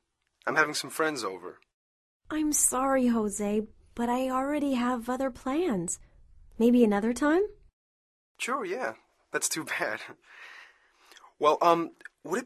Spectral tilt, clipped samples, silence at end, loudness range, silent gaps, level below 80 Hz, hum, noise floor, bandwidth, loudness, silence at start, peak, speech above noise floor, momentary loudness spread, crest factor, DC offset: -3.5 dB/octave; under 0.1%; 0 s; 6 LU; 1.74-2.20 s, 7.73-8.35 s; -60 dBFS; none; -59 dBFS; 13.5 kHz; -28 LUFS; 0.45 s; -8 dBFS; 32 dB; 15 LU; 22 dB; under 0.1%